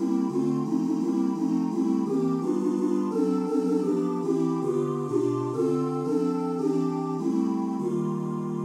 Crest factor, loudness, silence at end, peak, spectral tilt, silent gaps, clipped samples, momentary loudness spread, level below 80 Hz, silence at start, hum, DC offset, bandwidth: 12 dB; -26 LUFS; 0 s; -14 dBFS; -8.5 dB/octave; none; under 0.1%; 3 LU; -78 dBFS; 0 s; none; under 0.1%; 11.5 kHz